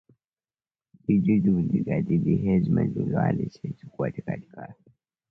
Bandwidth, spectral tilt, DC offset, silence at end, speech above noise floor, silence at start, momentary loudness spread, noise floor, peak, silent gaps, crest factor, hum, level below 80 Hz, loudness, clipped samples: 5.8 kHz; -11 dB/octave; under 0.1%; 0.6 s; over 65 dB; 1.1 s; 15 LU; under -90 dBFS; -12 dBFS; none; 14 dB; none; -52 dBFS; -25 LUFS; under 0.1%